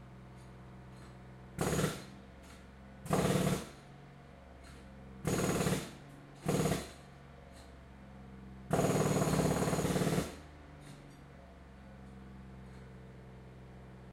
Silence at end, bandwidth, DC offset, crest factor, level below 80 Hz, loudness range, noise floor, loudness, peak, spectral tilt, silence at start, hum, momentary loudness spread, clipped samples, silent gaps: 0 s; 16 kHz; under 0.1%; 22 dB; -54 dBFS; 8 LU; -54 dBFS; -34 LUFS; -16 dBFS; -5.5 dB/octave; 0 s; none; 23 LU; under 0.1%; none